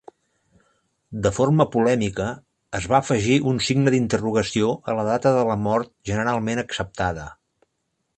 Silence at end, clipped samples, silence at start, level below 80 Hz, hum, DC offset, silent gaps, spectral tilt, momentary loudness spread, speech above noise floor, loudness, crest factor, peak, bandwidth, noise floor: 0.85 s; under 0.1%; 1.1 s; -48 dBFS; none; under 0.1%; none; -5.5 dB/octave; 10 LU; 54 dB; -22 LUFS; 20 dB; -4 dBFS; 9 kHz; -75 dBFS